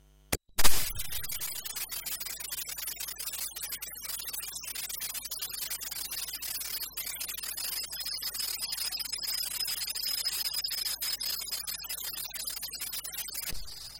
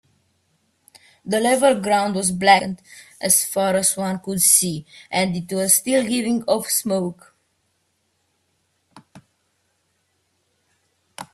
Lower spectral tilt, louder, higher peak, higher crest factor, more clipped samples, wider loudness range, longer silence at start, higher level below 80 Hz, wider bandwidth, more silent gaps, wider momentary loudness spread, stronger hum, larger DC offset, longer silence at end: second, 0 dB/octave vs -3 dB/octave; second, -33 LUFS vs -18 LUFS; second, -4 dBFS vs 0 dBFS; first, 28 dB vs 22 dB; neither; second, 4 LU vs 9 LU; second, 0 s vs 1.25 s; first, -48 dBFS vs -62 dBFS; about the same, 17 kHz vs 16 kHz; neither; second, 6 LU vs 13 LU; neither; neither; about the same, 0 s vs 0.1 s